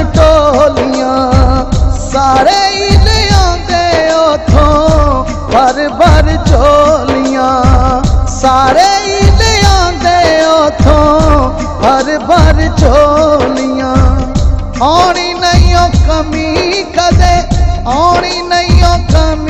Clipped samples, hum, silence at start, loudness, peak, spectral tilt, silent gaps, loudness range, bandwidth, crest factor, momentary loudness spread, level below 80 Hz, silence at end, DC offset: 1%; none; 0 s; -9 LUFS; 0 dBFS; -5.5 dB/octave; none; 2 LU; 10.5 kHz; 8 dB; 5 LU; -14 dBFS; 0 s; under 0.1%